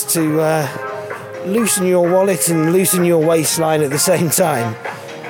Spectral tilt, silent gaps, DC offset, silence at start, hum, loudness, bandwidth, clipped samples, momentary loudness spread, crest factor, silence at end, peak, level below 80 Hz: -4.5 dB/octave; none; under 0.1%; 0 s; none; -15 LUFS; 19 kHz; under 0.1%; 12 LU; 14 dB; 0 s; -2 dBFS; -64 dBFS